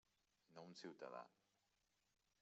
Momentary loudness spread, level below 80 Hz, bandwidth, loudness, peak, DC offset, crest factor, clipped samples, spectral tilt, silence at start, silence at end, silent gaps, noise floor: 11 LU; under -90 dBFS; 7.6 kHz; -59 LUFS; -40 dBFS; under 0.1%; 22 dB; under 0.1%; -3.5 dB/octave; 0.5 s; 1.1 s; none; -87 dBFS